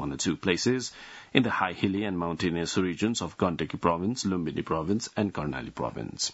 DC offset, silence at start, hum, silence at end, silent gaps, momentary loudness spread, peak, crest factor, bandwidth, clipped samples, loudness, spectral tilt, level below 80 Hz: under 0.1%; 0 s; none; 0 s; none; 7 LU; -4 dBFS; 24 dB; 8.2 kHz; under 0.1%; -29 LUFS; -4.5 dB/octave; -56 dBFS